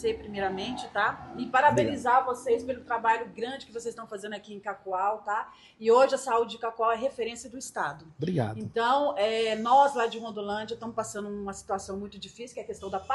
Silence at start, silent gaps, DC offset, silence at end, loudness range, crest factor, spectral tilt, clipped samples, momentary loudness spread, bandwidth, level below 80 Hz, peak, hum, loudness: 0 s; none; under 0.1%; 0 s; 4 LU; 20 dB; -4.5 dB/octave; under 0.1%; 16 LU; 12 kHz; -62 dBFS; -8 dBFS; none; -28 LUFS